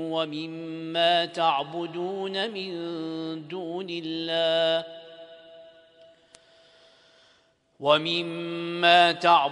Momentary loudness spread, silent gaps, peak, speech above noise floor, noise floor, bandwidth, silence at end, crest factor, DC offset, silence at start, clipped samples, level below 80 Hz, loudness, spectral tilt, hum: 15 LU; none; -4 dBFS; 39 dB; -64 dBFS; 10.5 kHz; 0 s; 22 dB; under 0.1%; 0 s; under 0.1%; -76 dBFS; -25 LUFS; -4.5 dB/octave; none